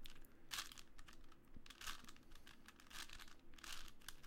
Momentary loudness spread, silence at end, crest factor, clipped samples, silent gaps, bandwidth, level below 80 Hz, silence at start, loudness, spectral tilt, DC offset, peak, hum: 16 LU; 0 s; 22 dB; under 0.1%; none; 16.5 kHz; -60 dBFS; 0 s; -56 LUFS; -1 dB/octave; under 0.1%; -32 dBFS; none